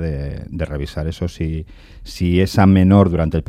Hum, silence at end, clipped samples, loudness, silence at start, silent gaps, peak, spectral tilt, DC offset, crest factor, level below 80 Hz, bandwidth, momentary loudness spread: none; 0.05 s; under 0.1%; -17 LUFS; 0 s; none; -2 dBFS; -8 dB/octave; under 0.1%; 16 dB; -34 dBFS; 14 kHz; 15 LU